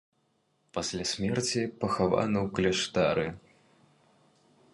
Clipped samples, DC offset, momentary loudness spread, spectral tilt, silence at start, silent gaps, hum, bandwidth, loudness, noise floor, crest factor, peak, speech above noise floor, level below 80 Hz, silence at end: under 0.1%; under 0.1%; 8 LU; -4.5 dB/octave; 0.75 s; none; none; 11.5 kHz; -29 LUFS; -73 dBFS; 20 dB; -10 dBFS; 44 dB; -56 dBFS; 1.35 s